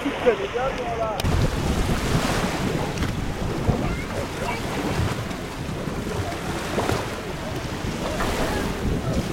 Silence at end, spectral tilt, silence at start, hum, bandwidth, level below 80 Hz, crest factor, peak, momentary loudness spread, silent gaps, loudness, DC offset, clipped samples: 0 s; -5.5 dB/octave; 0 s; none; 16.5 kHz; -34 dBFS; 18 dB; -6 dBFS; 6 LU; none; -26 LUFS; under 0.1%; under 0.1%